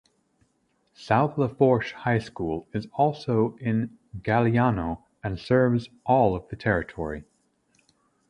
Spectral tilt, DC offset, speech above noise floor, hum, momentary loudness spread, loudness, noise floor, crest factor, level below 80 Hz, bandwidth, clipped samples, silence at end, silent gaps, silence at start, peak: -8.5 dB/octave; under 0.1%; 46 dB; none; 12 LU; -25 LUFS; -70 dBFS; 20 dB; -50 dBFS; 10 kHz; under 0.1%; 1.05 s; none; 1 s; -6 dBFS